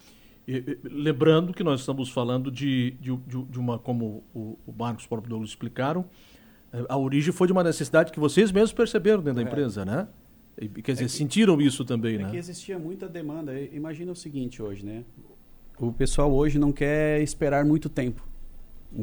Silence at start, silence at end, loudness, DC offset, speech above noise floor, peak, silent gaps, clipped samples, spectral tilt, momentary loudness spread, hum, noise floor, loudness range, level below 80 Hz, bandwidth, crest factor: 0.45 s; 0 s; -26 LUFS; under 0.1%; 23 dB; -6 dBFS; none; under 0.1%; -6 dB/octave; 14 LU; none; -48 dBFS; 9 LU; -40 dBFS; over 20 kHz; 20 dB